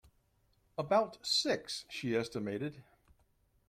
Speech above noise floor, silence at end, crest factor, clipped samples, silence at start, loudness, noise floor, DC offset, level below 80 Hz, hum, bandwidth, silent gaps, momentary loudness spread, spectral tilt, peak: 38 dB; 0.85 s; 20 dB; under 0.1%; 0.8 s; -35 LUFS; -73 dBFS; under 0.1%; -70 dBFS; none; 16 kHz; none; 11 LU; -3.5 dB/octave; -18 dBFS